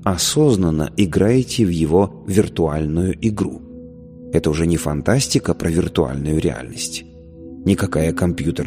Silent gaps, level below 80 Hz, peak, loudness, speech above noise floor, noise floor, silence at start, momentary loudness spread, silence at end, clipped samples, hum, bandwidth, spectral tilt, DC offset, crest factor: none; -36 dBFS; 0 dBFS; -19 LUFS; 20 dB; -37 dBFS; 0 s; 10 LU; 0 s; under 0.1%; none; 15.5 kHz; -5.5 dB/octave; under 0.1%; 18 dB